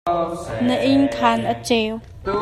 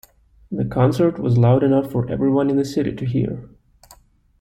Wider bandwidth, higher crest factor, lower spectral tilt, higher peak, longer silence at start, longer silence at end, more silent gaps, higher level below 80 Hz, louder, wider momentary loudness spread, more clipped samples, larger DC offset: second, 12.5 kHz vs 14.5 kHz; about the same, 16 dB vs 16 dB; second, -5 dB/octave vs -9 dB/octave; about the same, -4 dBFS vs -4 dBFS; second, 0.05 s vs 0.5 s; second, 0 s vs 0.95 s; neither; about the same, -44 dBFS vs -46 dBFS; about the same, -20 LUFS vs -19 LUFS; about the same, 9 LU vs 11 LU; neither; neither